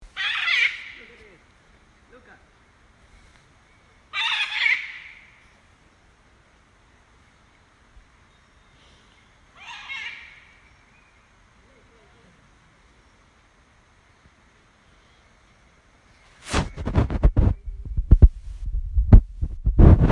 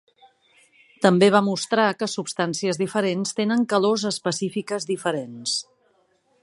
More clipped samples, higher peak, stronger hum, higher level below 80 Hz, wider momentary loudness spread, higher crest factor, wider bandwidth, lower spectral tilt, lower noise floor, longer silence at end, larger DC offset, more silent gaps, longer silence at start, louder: neither; about the same, 0 dBFS vs -2 dBFS; neither; first, -26 dBFS vs -72 dBFS; first, 23 LU vs 10 LU; about the same, 24 dB vs 22 dB; about the same, 10.5 kHz vs 11.5 kHz; first, -6 dB/octave vs -4.5 dB/octave; second, -57 dBFS vs -64 dBFS; second, 0 s vs 0.8 s; neither; neither; second, 0.15 s vs 1 s; about the same, -22 LUFS vs -22 LUFS